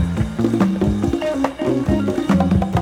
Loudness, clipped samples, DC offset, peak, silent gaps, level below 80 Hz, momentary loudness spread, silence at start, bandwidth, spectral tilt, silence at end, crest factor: -19 LUFS; under 0.1%; under 0.1%; -2 dBFS; none; -32 dBFS; 4 LU; 0 s; 13.5 kHz; -7.5 dB/octave; 0 s; 14 dB